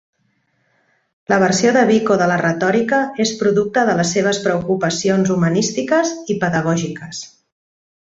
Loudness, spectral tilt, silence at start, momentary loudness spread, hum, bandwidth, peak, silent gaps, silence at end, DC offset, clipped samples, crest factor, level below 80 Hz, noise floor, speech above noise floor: -16 LUFS; -5 dB/octave; 1.3 s; 7 LU; none; 8 kHz; -2 dBFS; none; 0.8 s; under 0.1%; under 0.1%; 16 dB; -56 dBFS; -64 dBFS; 48 dB